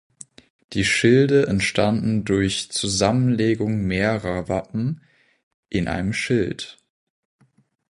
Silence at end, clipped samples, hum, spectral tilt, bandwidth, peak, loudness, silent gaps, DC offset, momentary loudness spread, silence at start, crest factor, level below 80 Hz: 1.25 s; under 0.1%; none; -5 dB/octave; 11.5 kHz; -2 dBFS; -21 LUFS; 5.43-5.63 s; under 0.1%; 12 LU; 0.7 s; 20 dB; -44 dBFS